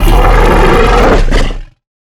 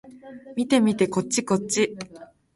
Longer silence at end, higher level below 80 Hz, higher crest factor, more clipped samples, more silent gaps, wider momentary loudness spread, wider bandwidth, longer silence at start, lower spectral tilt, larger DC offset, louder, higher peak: first, 0.45 s vs 0.3 s; first, -10 dBFS vs -64 dBFS; second, 6 dB vs 20 dB; first, 0.1% vs under 0.1%; neither; second, 10 LU vs 19 LU; first, 14.5 kHz vs 11.5 kHz; about the same, 0 s vs 0.05 s; first, -6 dB/octave vs -4.5 dB/octave; neither; first, -9 LUFS vs -23 LUFS; first, 0 dBFS vs -4 dBFS